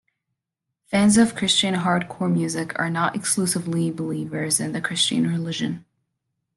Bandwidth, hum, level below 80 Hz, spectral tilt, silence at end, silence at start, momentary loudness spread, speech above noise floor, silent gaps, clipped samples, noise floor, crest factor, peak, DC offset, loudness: 12.5 kHz; none; -58 dBFS; -4 dB/octave; 0.75 s; 0.9 s; 9 LU; 61 dB; none; under 0.1%; -83 dBFS; 18 dB; -4 dBFS; under 0.1%; -22 LUFS